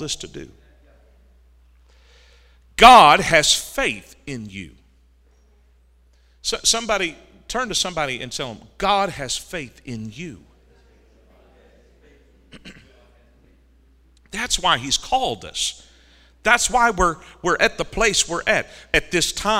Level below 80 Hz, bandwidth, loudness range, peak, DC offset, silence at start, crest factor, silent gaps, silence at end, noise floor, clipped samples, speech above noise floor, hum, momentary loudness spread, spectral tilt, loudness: -42 dBFS; 16 kHz; 12 LU; 0 dBFS; under 0.1%; 0 s; 22 dB; none; 0 s; -55 dBFS; under 0.1%; 36 dB; none; 19 LU; -2 dB/octave; -18 LUFS